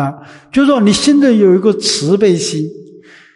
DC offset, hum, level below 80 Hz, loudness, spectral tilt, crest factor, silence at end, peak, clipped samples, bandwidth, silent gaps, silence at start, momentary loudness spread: under 0.1%; none; -50 dBFS; -11 LUFS; -5 dB/octave; 12 dB; 0.5 s; 0 dBFS; under 0.1%; 11.5 kHz; none; 0 s; 11 LU